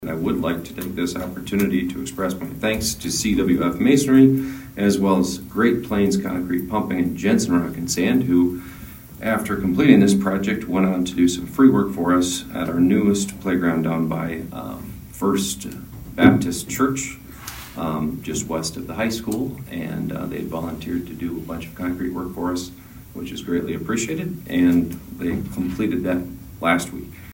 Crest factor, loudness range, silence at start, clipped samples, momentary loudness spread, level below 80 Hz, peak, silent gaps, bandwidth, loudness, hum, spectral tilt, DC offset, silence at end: 20 dB; 9 LU; 0 s; under 0.1%; 14 LU; -44 dBFS; 0 dBFS; none; 16.5 kHz; -21 LUFS; none; -5.5 dB/octave; under 0.1%; 0 s